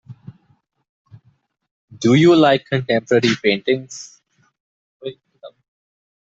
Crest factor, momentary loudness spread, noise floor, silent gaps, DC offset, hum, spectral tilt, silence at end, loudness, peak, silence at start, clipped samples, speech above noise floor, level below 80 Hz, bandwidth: 18 dB; 22 LU; -61 dBFS; 0.89-1.05 s, 1.71-1.88 s, 4.60-5.00 s; under 0.1%; none; -6 dB/octave; 0.9 s; -16 LUFS; -2 dBFS; 0.1 s; under 0.1%; 46 dB; -60 dBFS; 7.8 kHz